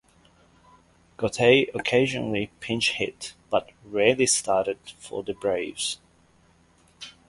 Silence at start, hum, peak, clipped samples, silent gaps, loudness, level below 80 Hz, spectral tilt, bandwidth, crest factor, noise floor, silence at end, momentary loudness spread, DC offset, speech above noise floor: 1.2 s; none; -2 dBFS; under 0.1%; none; -24 LUFS; -58 dBFS; -3 dB/octave; 11.5 kHz; 24 dB; -60 dBFS; 0.2 s; 16 LU; under 0.1%; 35 dB